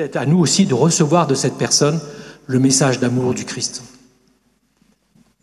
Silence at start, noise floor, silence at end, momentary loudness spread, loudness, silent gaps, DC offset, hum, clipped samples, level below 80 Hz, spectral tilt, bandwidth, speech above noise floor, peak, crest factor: 0 s; -61 dBFS; 1.55 s; 11 LU; -16 LUFS; none; under 0.1%; none; under 0.1%; -56 dBFS; -4.5 dB/octave; 13 kHz; 45 dB; 0 dBFS; 18 dB